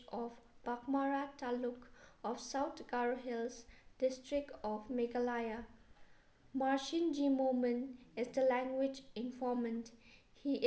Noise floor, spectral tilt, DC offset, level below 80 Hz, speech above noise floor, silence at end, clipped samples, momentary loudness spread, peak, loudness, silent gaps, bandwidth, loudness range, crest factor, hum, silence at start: -64 dBFS; -4.5 dB/octave; under 0.1%; -70 dBFS; 26 dB; 0 s; under 0.1%; 12 LU; -22 dBFS; -39 LUFS; none; 8 kHz; 4 LU; 16 dB; none; 0 s